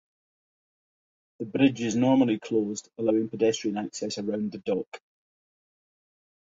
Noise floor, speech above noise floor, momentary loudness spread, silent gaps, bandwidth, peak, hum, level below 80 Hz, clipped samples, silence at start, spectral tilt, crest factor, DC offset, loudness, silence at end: under -90 dBFS; over 64 dB; 10 LU; 4.88-4.92 s; 7.8 kHz; -10 dBFS; none; -70 dBFS; under 0.1%; 1.4 s; -5.5 dB/octave; 20 dB; under 0.1%; -27 LUFS; 1.6 s